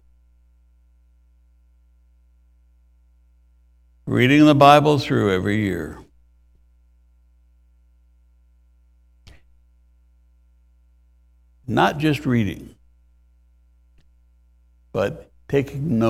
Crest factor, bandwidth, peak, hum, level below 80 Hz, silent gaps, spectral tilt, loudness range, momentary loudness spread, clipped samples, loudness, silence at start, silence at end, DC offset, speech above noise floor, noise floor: 24 dB; 15 kHz; 0 dBFS; 60 Hz at -55 dBFS; -50 dBFS; none; -6.5 dB/octave; 12 LU; 24 LU; under 0.1%; -18 LUFS; 4.05 s; 0 s; under 0.1%; 39 dB; -56 dBFS